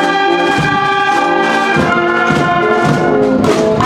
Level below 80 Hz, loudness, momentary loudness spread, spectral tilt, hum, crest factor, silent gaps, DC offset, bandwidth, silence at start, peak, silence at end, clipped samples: -40 dBFS; -11 LUFS; 0 LU; -5.5 dB/octave; none; 12 dB; none; under 0.1%; 14 kHz; 0 s; 0 dBFS; 0 s; under 0.1%